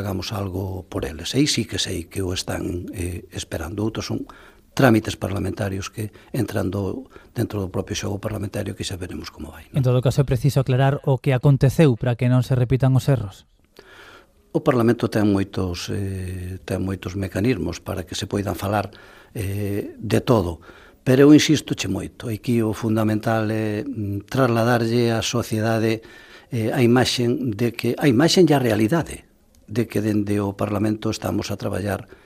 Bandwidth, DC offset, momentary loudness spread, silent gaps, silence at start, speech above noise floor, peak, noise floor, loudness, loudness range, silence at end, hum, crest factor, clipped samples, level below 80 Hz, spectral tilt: 15.5 kHz; under 0.1%; 12 LU; none; 0 s; 28 dB; -2 dBFS; -49 dBFS; -22 LUFS; 7 LU; 0.2 s; none; 20 dB; under 0.1%; -46 dBFS; -6 dB/octave